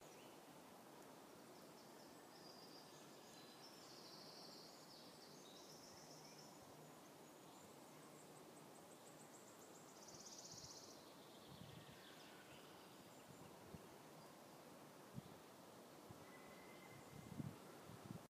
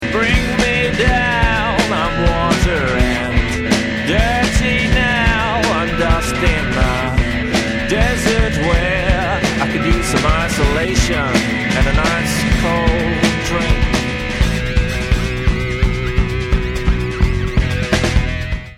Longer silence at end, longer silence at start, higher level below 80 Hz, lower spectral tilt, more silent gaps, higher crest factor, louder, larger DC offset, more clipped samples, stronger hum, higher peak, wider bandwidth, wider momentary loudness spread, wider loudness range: about the same, 0 s vs 0 s; about the same, 0 s vs 0 s; second, -86 dBFS vs -20 dBFS; second, -3.5 dB/octave vs -5 dB/octave; neither; first, 24 dB vs 14 dB; second, -60 LUFS vs -16 LUFS; neither; neither; neither; second, -38 dBFS vs -2 dBFS; about the same, 15.5 kHz vs 15.5 kHz; about the same, 5 LU vs 4 LU; about the same, 2 LU vs 3 LU